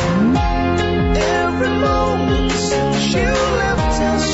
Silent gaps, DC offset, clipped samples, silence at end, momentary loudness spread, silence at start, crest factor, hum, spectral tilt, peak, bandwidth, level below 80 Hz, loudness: none; under 0.1%; under 0.1%; 0 s; 1 LU; 0 s; 10 dB; none; -5 dB/octave; -6 dBFS; 8 kHz; -26 dBFS; -17 LUFS